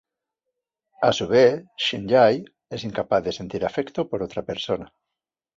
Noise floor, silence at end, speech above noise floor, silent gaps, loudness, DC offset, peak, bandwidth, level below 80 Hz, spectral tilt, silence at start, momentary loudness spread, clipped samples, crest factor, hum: -86 dBFS; 0.7 s; 64 dB; none; -23 LUFS; under 0.1%; -4 dBFS; 7.8 kHz; -56 dBFS; -5 dB/octave; 1 s; 12 LU; under 0.1%; 20 dB; none